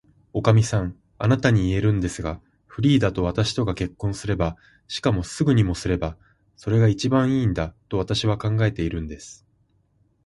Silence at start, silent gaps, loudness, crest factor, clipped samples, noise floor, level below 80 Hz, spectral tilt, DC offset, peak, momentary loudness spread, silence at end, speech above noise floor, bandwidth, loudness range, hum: 0.35 s; none; -23 LUFS; 18 dB; under 0.1%; -64 dBFS; -40 dBFS; -6.5 dB/octave; under 0.1%; -4 dBFS; 13 LU; 0.9 s; 42 dB; 11.5 kHz; 3 LU; none